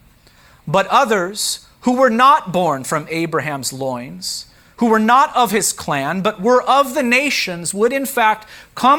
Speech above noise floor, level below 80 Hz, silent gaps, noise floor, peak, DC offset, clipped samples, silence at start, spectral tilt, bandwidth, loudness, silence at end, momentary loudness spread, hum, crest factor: 33 dB; -54 dBFS; none; -49 dBFS; -2 dBFS; under 0.1%; under 0.1%; 0.65 s; -3.5 dB/octave; over 20 kHz; -16 LUFS; 0 s; 12 LU; none; 16 dB